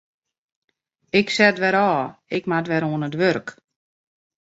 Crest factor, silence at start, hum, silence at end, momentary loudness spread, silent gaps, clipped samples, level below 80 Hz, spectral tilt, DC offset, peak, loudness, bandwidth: 20 dB; 1.15 s; none; 0.95 s; 11 LU; none; under 0.1%; -64 dBFS; -5.5 dB/octave; under 0.1%; -2 dBFS; -20 LUFS; 8 kHz